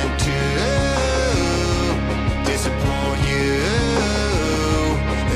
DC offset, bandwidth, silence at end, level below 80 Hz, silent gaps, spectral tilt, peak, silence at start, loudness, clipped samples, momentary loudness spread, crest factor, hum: under 0.1%; 14.5 kHz; 0 s; -26 dBFS; none; -5 dB/octave; -8 dBFS; 0 s; -20 LUFS; under 0.1%; 2 LU; 10 dB; none